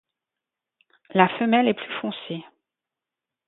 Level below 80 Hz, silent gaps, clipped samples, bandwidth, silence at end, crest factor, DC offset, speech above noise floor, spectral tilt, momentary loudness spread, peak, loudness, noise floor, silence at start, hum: -74 dBFS; none; under 0.1%; 4.1 kHz; 1.05 s; 26 dB; under 0.1%; 65 dB; -10 dB/octave; 15 LU; 0 dBFS; -23 LUFS; -88 dBFS; 1.15 s; none